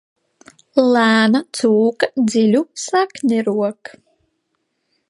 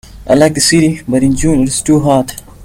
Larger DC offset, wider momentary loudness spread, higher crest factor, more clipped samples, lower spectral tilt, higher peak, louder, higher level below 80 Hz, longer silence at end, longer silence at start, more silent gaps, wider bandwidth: neither; first, 8 LU vs 5 LU; about the same, 16 dB vs 12 dB; neither; about the same, -4.5 dB/octave vs -4.5 dB/octave; about the same, 0 dBFS vs 0 dBFS; second, -16 LUFS vs -11 LUFS; second, -68 dBFS vs -30 dBFS; first, 1.4 s vs 0 s; first, 0.75 s vs 0.1 s; neither; second, 11.5 kHz vs 17 kHz